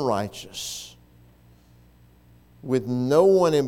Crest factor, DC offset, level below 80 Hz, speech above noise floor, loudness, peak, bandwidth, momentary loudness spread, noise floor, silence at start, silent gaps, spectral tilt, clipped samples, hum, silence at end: 18 dB; under 0.1%; -58 dBFS; 32 dB; -23 LUFS; -6 dBFS; 16.5 kHz; 20 LU; -54 dBFS; 0 s; none; -5.5 dB/octave; under 0.1%; 60 Hz at -55 dBFS; 0 s